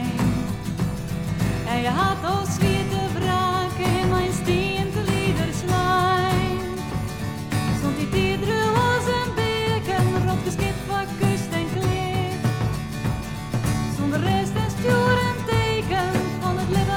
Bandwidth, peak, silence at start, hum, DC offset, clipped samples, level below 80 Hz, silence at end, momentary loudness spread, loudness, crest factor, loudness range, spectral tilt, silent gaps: 17 kHz; -8 dBFS; 0 s; none; under 0.1%; under 0.1%; -38 dBFS; 0 s; 7 LU; -23 LUFS; 14 dB; 2 LU; -5.5 dB/octave; none